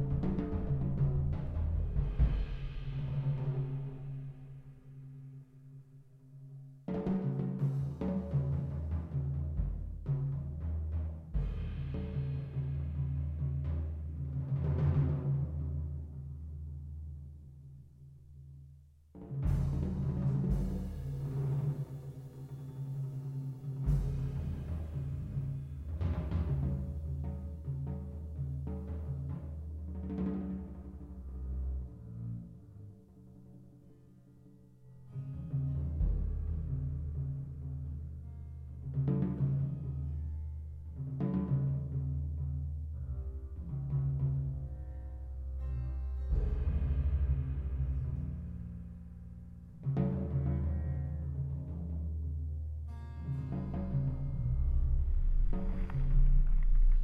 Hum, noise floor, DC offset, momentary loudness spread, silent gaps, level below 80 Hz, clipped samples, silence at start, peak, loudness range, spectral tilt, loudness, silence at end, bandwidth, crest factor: none; -58 dBFS; under 0.1%; 16 LU; none; -38 dBFS; under 0.1%; 0 s; -18 dBFS; 7 LU; -10.5 dB/octave; -37 LUFS; 0 s; 4 kHz; 18 dB